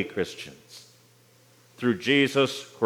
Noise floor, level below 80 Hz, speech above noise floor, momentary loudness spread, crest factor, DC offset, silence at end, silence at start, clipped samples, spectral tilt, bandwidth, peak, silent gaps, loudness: -58 dBFS; -74 dBFS; 32 dB; 25 LU; 20 dB; under 0.1%; 0 s; 0 s; under 0.1%; -4.5 dB/octave; 16.5 kHz; -8 dBFS; none; -25 LUFS